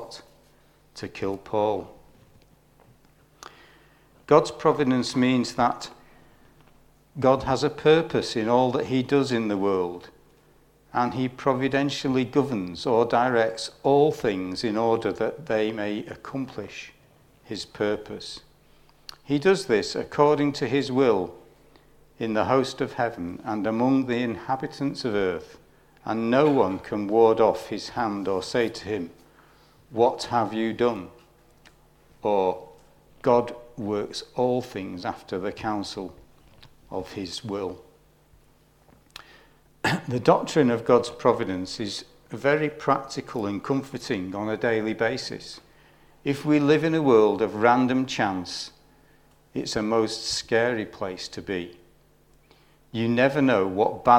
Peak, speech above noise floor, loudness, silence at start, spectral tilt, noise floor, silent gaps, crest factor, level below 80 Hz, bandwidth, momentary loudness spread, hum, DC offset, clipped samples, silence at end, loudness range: -2 dBFS; 35 dB; -25 LUFS; 0 s; -5.5 dB/octave; -59 dBFS; none; 24 dB; -58 dBFS; 15 kHz; 15 LU; none; under 0.1%; under 0.1%; 0 s; 8 LU